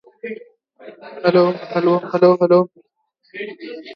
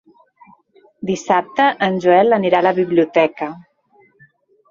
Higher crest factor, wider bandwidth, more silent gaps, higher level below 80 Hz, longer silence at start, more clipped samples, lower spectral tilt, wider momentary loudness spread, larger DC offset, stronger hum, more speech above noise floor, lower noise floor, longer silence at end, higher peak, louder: about the same, 18 dB vs 16 dB; second, 6 kHz vs 7.6 kHz; neither; second, -72 dBFS vs -62 dBFS; second, 0.25 s vs 1 s; neither; first, -9 dB/octave vs -6 dB/octave; first, 20 LU vs 12 LU; neither; neither; first, 46 dB vs 40 dB; first, -63 dBFS vs -55 dBFS; second, 0 s vs 1.1 s; about the same, 0 dBFS vs 0 dBFS; about the same, -16 LUFS vs -16 LUFS